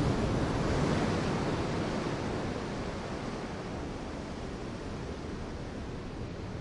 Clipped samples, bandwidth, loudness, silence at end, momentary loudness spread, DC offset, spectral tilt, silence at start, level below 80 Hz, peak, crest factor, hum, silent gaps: under 0.1%; 11.5 kHz; -35 LUFS; 0 s; 10 LU; under 0.1%; -6 dB/octave; 0 s; -44 dBFS; -18 dBFS; 16 dB; none; none